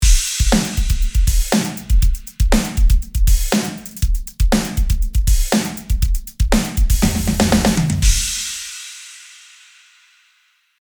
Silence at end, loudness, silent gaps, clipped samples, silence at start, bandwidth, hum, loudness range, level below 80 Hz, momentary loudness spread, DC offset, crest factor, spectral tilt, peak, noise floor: 1.6 s; -18 LUFS; none; under 0.1%; 0 s; over 20 kHz; none; 2 LU; -18 dBFS; 8 LU; under 0.1%; 16 dB; -4.5 dB/octave; 0 dBFS; -59 dBFS